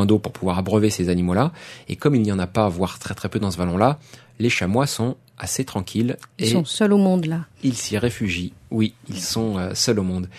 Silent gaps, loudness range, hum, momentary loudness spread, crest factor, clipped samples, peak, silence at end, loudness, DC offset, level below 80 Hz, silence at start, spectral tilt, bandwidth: none; 2 LU; none; 8 LU; 20 dB; under 0.1%; 0 dBFS; 0 s; -22 LUFS; under 0.1%; -50 dBFS; 0 s; -5.5 dB/octave; 13.5 kHz